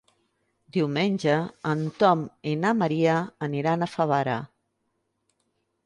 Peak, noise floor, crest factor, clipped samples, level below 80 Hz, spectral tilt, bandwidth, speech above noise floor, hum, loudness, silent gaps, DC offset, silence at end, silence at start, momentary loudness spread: -8 dBFS; -76 dBFS; 20 dB; under 0.1%; -68 dBFS; -7 dB/octave; 11 kHz; 51 dB; none; -25 LUFS; none; under 0.1%; 1.4 s; 0.75 s; 8 LU